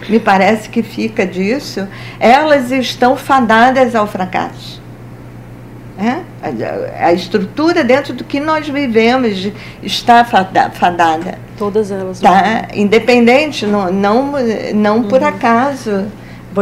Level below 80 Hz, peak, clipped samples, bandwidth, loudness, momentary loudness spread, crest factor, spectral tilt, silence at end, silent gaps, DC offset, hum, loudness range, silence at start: -42 dBFS; 0 dBFS; 0.3%; 16 kHz; -12 LUFS; 16 LU; 12 dB; -5.5 dB/octave; 0 s; none; under 0.1%; none; 5 LU; 0 s